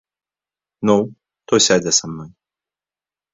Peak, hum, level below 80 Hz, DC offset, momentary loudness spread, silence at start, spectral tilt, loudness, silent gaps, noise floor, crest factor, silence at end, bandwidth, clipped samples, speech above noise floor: 0 dBFS; 50 Hz at -45 dBFS; -56 dBFS; under 0.1%; 17 LU; 0.8 s; -3 dB/octave; -16 LUFS; none; under -90 dBFS; 20 dB; 1.05 s; 7.8 kHz; under 0.1%; over 73 dB